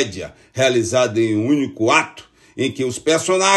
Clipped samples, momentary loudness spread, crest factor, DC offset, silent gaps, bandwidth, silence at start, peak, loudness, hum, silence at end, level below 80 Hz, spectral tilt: under 0.1%; 14 LU; 18 dB; under 0.1%; none; 12.5 kHz; 0 s; 0 dBFS; -18 LUFS; none; 0 s; -56 dBFS; -4 dB/octave